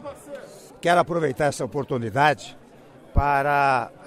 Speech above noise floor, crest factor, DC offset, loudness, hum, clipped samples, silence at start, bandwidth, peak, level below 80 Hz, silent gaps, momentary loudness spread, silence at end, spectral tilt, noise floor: 26 dB; 18 dB; under 0.1%; -22 LUFS; none; under 0.1%; 0 s; 15 kHz; -6 dBFS; -38 dBFS; none; 19 LU; 0 s; -5.5 dB/octave; -48 dBFS